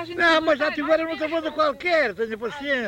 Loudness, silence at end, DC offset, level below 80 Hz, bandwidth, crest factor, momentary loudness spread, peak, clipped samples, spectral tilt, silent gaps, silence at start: -22 LUFS; 0 s; under 0.1%; -56 dBFS; 15.5 kHz; 14 dB; 9 LU; -8 dBFS; under 0.1%; -4 dB/octave; none; 0 s